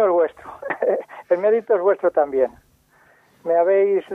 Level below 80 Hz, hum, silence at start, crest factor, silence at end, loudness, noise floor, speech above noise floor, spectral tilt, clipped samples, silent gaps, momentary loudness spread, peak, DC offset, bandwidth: -64 dBFS; none; 0 s; 14 dB; 0 s; -20 LUFS; -56 dBFS; 38 dB; -7.5 dB/octave; under 0.1%; none; 9 LU; -6 dBFS; under 0.1%; 3.8 kHz